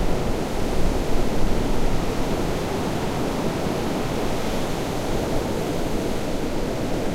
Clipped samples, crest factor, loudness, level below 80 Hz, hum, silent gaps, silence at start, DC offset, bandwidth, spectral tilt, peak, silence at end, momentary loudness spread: under 0.1%; 16 dB; -26 LUFS; -28 dBFS; none; none; 0 s; under 0.1%; 16 kHz; -5.5 dB/octave; -6 dBFS; 0 s; 1 LU